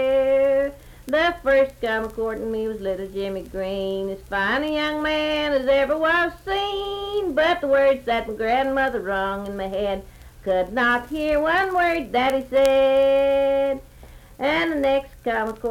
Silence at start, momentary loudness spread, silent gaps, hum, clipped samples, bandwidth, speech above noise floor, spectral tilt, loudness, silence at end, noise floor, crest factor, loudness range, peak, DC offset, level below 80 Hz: 0 s; 9 LU; none; none; under 0.1%; 15.5 kHz; 23 dB; -5 dB/octave; -22 LUFS; 0 s; -44 dBFS; 20 dB; 5 LU; -2 dBFS; under 0.1%; -44 dBFS